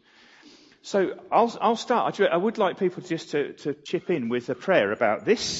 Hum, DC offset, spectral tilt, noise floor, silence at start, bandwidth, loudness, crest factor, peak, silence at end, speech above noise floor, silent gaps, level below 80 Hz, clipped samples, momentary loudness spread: none; under 0.1%; -4.5 dB/octave; -53 dBFS; 0.85 s; 8 kHz; -25 LUFS; 20 dB; -6 dBFS; 0 s; 29 dB; none; -68 dBFS; under 0.1%; 8 LU